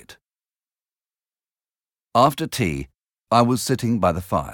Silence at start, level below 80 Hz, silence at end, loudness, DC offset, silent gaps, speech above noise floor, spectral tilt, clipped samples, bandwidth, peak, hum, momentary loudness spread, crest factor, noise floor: 0.1 s; -48 dBFS; 0 s; -21 LUFS; under 0.1%; none; over 70 dB; -5.5 dB/octave; under 0.1%; 19 kHz; -4 dBFS; none; 7 LU; 20 dB; under -90 dBFS